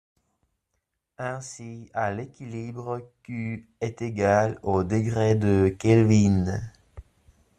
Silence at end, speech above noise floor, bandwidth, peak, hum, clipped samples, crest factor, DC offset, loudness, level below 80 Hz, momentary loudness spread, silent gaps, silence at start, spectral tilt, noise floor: 0.6 s; 55 dB; 9.6 kHz; -6 dBFS; none; under 0.1%; 20 dB; under 0.1%; -25 LUFS; -54 dBFS; 16 LU; none; 1.2 s; -7.5 dB/octave; -79 dBFS